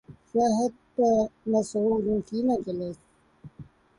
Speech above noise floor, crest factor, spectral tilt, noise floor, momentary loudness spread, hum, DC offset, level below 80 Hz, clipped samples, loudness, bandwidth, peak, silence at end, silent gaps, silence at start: 26 dB; 14 dB; -7 dB/octave; -51 dBFS; 10 LU; none; under 0.1%; -58 dBFS; under 0.1%; -26 LUFS; 11.5 kHz; -12 dBFS; 0.35 s; none; 0.1 s